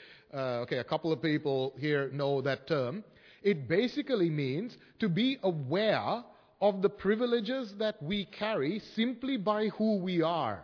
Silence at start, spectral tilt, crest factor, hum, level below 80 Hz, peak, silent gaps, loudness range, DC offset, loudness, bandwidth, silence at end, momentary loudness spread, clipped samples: 0 s; -7.5 dB/octave; 16 dB; none; -68 dBFS; -14 dBFS; none; 1 LU; under 0.1%; -32 LUFS; 5.4 kHz; 0 s; 6 LU; under 0.1%